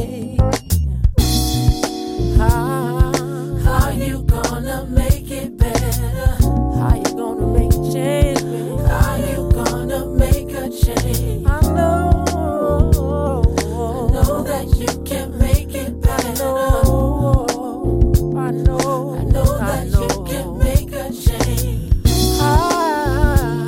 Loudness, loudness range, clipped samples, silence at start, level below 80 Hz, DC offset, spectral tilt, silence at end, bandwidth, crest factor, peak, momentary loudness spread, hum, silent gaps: -18 LUFS; 2 LU; under 0.1%; 0 s; -20 dBFS; under 0.1%; -6 dB/octave; 0 s; 17 kHz; 14 dB; -2 dBFS; 6 LU; none; none